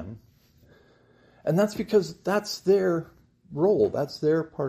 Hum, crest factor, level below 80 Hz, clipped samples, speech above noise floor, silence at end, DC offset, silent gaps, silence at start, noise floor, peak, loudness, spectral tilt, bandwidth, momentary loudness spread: none; 16 dB; -62 dBFS; under 0.1%; 35 dB; 0 s; under 0.1%; none; 0 s; -59 dBFS; -10 dBFS; -25 LUFS; -6.5 dB/octave; 15 kHz; 9 LU